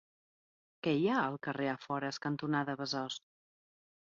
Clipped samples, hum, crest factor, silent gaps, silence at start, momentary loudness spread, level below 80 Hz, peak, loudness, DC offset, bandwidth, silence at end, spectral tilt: under 0.1%; none; 18 dB; none; 0.85 s; 7 LU; -78 dBFS; -20 dBFS; -35 LUFS; under 0.1%; 7.4 kHz; 0.85 s; -4 dB/octave